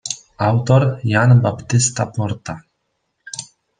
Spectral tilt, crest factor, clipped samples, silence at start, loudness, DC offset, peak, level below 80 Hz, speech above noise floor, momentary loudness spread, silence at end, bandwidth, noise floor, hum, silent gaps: -5.5 dB/octave; 16 dB; under 0.1%; 0.05 s; -17 LUFS; under 0.1%; -2 dBFS; -52 dBFS; 55 dB; 18 LU; 0.35 s; 9.8 kHz; -71 dBFS; none; none